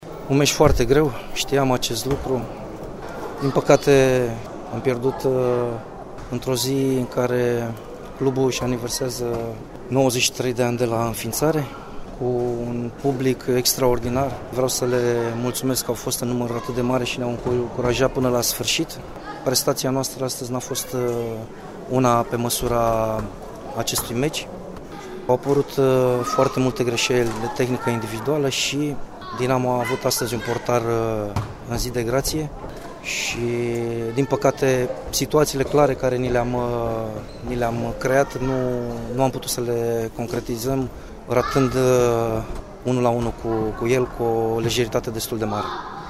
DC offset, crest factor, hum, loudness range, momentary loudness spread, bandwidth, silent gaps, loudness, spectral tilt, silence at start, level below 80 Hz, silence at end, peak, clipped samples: under 0.1%; 22 dB; none; 3 LU; 12 LU; 16 kHz; none; -22 LUFS; -4.5 dB/octave; 0 s; -40 dBFS; 0 s; 0 dBFS; under 0.1%